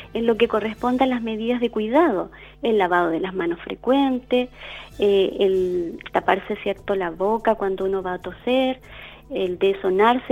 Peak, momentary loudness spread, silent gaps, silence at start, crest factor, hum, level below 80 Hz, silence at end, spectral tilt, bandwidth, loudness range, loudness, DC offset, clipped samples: -4 dBFS; 9 LU; none; 0 s; 18 dB; none; -50 dBFS; 0 s; -6.5 dB/octave; 9.4 kHz; 2 LU; -22 LUFS; under 0.1%; under 0.1%